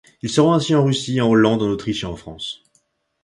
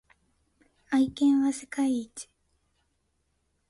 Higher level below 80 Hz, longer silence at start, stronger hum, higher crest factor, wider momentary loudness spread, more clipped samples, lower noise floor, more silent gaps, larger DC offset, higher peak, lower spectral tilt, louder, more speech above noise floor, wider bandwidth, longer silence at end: first, -50 dBFS vs -66 dBFS; second, 0.25 s vs 0.9 s; neither; about the same, 16 dB vs 14 dB; second, 15 LU vs 19 LU; neither; second, -65 dBFS vs -74 dBFS; neither; neither; first, -2 dBFS vs -16 dBFS; first, -6 dB/octave vs -4 dB/octave; first, -18 LUFS vs -27 LUFS; about the same, 47 dB vs 49 dB; about the same, 11.5 kHz vs 11.5 kHz; second, 0.7 s vs 1.45 s